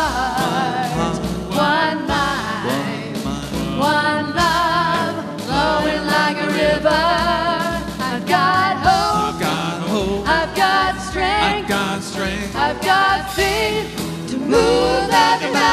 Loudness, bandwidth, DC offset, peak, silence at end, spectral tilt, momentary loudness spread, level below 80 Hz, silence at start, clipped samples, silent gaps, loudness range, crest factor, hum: -18 LUFS; 14 kHz; under 0.1%; -2 dBFS; 0 s; -4 dB/octave; 8 LU; -36 dBFS; 0 s; under 0.1%; none; 2 LU; 16 dB; none